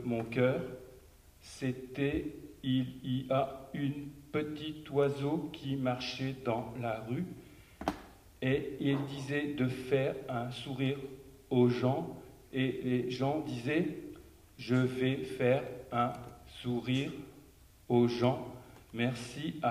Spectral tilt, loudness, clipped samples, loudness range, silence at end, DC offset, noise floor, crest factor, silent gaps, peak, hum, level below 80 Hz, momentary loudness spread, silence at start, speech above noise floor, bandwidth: -7 dB/octave; -34 LUFS; under 0.1%; 3 LU; 0 s; under 0.1%; -59 dBFS; 20 dB; none; -14 dBFS; none; -60 dBFS; 14 LU; 0 s; 25 dB; 15.5 kHz